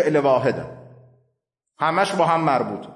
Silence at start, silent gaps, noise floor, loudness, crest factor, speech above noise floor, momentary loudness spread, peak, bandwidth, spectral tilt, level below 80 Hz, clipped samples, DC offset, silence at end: 0 s; none; -76 dBFS; -20 LUFS; 16 dB; 56 dB; 9 LU; -6 dBFS; 11.5 kHz; -6 dB/octave; -64 dBFS; under 0.1%; under 0.1%; 0 s